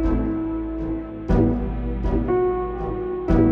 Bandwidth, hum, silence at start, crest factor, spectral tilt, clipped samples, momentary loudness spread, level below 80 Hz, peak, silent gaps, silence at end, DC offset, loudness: 5.2 kHz; none; 0 s; 16 dB; -10.5 dB/octave; under 0.1%; 7 LU; -28 dBFS; -6 dBFS; none; 0 s; under 0.1%; -24 LUFS